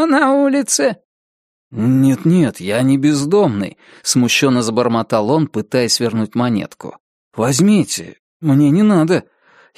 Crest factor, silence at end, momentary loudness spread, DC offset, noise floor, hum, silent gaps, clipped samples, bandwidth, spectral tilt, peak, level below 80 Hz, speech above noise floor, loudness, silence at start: 14 dB; 0.55 s; 11 LU; under 0.1%; under -90 dBFS; none; 1.05-1.71 s, 7.00-7.31 s, 8.19-8.40 s; under 0.1%; 15 kHz; -5 dB/octave; 0 dBFS; -58 dBFS; over 76 dB; -15 LUFS; 0 s